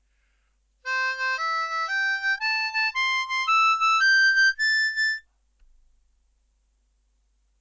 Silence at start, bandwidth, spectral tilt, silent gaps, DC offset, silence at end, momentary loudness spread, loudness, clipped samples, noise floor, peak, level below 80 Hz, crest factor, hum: 0.85 s; 7.8 kHz; 4.5 dB/octave; none; under 0.1%; 2.4 s; 8 LU; -22 LUFS; under 0.1%; -68 dBFS; -14 dBFS; -66 dBFS; 12 dB; none